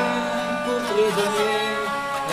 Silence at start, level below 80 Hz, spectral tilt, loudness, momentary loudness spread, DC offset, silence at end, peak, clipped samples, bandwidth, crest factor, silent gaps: 0 s; -56 dBFS; -3.5 dB/octave; -23 LUFS; 4 LU; under 0.1%; 0 s; -10 dBFS; under 0.1%; 15.5 kHz; 14 dB; none